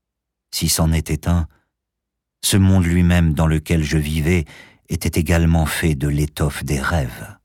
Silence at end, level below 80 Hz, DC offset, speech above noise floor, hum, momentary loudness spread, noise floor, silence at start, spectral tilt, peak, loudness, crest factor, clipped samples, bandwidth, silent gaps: 0.1 s; -28 dBFS; under 0.1%; 63 dB; none; 8 LU; -80 dBFS; 0.55 s; -5.5 dB/octave; -6 dBFS; -19 LUFS; 12 dB; under 0.1%; 17 kHz; none